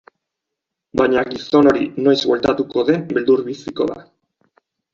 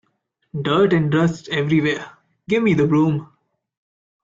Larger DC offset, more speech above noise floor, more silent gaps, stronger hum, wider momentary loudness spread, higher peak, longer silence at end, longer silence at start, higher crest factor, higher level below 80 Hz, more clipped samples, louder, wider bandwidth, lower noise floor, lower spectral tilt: neither; first, 65 dB vs 52 dB; neither; neither; about the same, 9 LU vs 11 LU; first, -2 dBFS vs -6 dBFS; about the same, 0.9 s vs 1 s; first, 0.95 s vs 0.55 s; about the same, 16 dB vs 14 dB; about the same, -52 dBFS vs -56 dBFS; neither; about the same, -17 LUFS vs -19 LUFS; about the same, 7.4 kHz vs 7.6 kHz; first, -81 dBFS vs -70 dBFS; second, -6 dB/octave vs -7.5 dB/octave